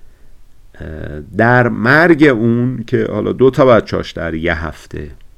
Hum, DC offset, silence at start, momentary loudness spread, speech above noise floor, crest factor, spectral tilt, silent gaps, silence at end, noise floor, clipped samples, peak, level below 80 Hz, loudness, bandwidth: none; under 0.1%; 0.05 s; 20 LU; 24 dB; 14 dB; -7.5 dB/octave; none; 0.1 s; -37 dBFS; under 0.1%; 0 dBFS; -36 dBFS; -13 LUFS; 12.5 kHz